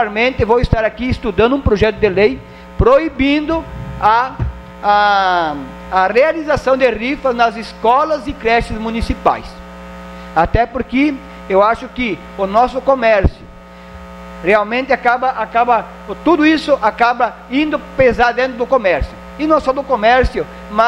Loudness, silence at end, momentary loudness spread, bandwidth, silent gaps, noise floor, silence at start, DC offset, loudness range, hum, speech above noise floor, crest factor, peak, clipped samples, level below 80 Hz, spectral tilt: -15 LUFS; 0 s; 11 LU; 11.5 kHz; none; -36 dBFS; 0 s; under 0.1%; 3 LU; none; 22 dB; 14 dB; 0 dBFS; under 0.1%; -30 dBFS; -6.5 dB/octave